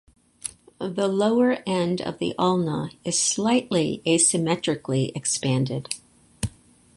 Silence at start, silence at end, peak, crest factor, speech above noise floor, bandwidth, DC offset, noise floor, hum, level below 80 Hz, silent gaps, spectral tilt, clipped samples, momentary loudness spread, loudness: 0.45 s; 0.5 s; -6 dBFS; 18 dB; 25 dB; 11.5 kHz; under 0.1%; -48 dBFS; none; -54 dBFS; none; -4 dB/octave; under 0.1%; 14 LU; -23 LUFS